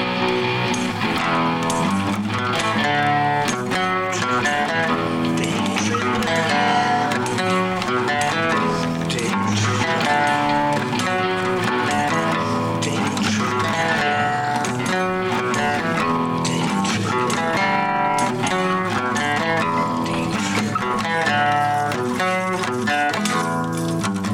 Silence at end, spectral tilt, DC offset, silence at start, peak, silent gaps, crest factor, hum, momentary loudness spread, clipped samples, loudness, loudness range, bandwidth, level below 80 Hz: 0 s; -4.5 dB/octave; under 0.1%; 0 s; -6 dBFS; none; 14 dB; none; 3 LU; under 0.1%; -20 LUFS; 1 LU; 17 kHz; -52 dBFS